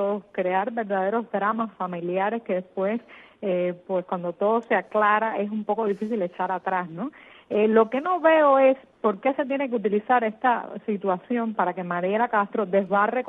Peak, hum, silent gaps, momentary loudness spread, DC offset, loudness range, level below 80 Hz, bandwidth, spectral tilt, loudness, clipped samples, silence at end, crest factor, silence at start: -6 dBFS; none; none; 9 LU; under 0.1%; 5 LU; -76 dBFS; 4 kHz; -8.5 dB/octave; -24 LUFS; under 0.1%; 0 s; 18 dB; 0 s